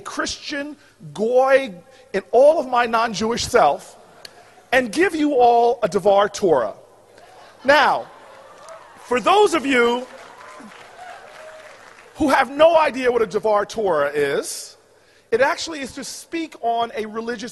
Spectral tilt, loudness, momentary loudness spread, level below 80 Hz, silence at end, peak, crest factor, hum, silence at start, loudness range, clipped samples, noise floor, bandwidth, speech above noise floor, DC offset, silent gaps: -3.5 dB/octave; -19 LUFS; 23 LU; -54 dBFS; 0 s; -2 dBFS; 18 dB; none; 0.05 s; 4 LU; under 0.1%; -54 dBFS; 12 kHz; 36 dB; under 0.1%; none